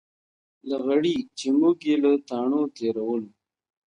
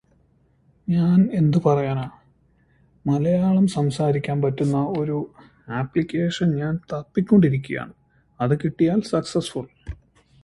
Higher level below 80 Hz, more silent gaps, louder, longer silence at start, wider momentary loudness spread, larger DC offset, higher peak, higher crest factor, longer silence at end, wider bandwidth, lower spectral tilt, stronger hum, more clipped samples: second, -72 dBFS vs -52 dBFS; neither; about the same, -24 LUFS vs -22 LUFS; second, 0.65 s vs 0.9 s; second, 10 LU vs 15 LU; neither; second, -10 dBFS vs -4 dBFS; about the same, 16 dB vs 18 dB; first, 0.65 s vs 0.5 s; second, 9.8 kHz vs 11.5 kHz; second, -5.5 dB/octave vs -8 dB/octave; neither; neither